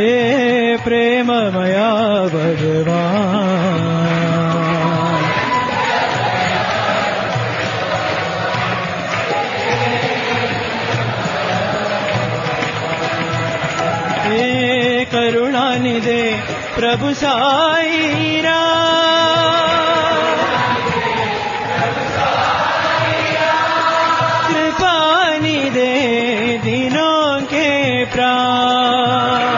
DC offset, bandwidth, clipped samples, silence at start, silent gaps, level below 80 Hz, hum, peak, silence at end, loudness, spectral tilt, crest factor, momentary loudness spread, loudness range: under 0.1%; 7.4 kHz; under 0.1%; 0 s; none; -48 dBFS; none; -2 dBFS; 0 s; -15 LUFS; -5 dB/octave; 14 dB; 5 LU; 4 LU